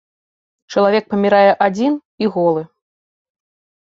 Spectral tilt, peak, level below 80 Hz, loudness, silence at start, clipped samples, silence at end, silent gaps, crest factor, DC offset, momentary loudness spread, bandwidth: -6.5 dB/octave; -2 dBFS; -64 dBFS; -16 LUFS; 0.7 s; under 0.1%; 1.3 s; 2.05-2.18 s; 16 dB; under 0.1%; 9 LU; 7.6 kHz